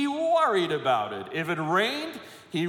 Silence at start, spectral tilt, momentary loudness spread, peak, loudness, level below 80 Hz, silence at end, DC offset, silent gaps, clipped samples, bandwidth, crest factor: 0 s; -5 dB/octave; 11 LU; -12 dBFS; -26 LUFS; -76 dBFS; 0 s; under 0.1%; none; under 0.1%; 18 kHz; 14 dB